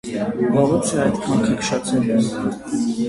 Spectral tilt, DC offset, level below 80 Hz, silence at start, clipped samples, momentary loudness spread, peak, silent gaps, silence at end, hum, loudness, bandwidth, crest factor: -5.5 dB/octave; under 0.1%; -50 dBFS; 0.05 s; under 0.1%; 6 LU; -4 dBFS; none; 0 s; none; -20 LUFS; 11.5 kHz; 16 dB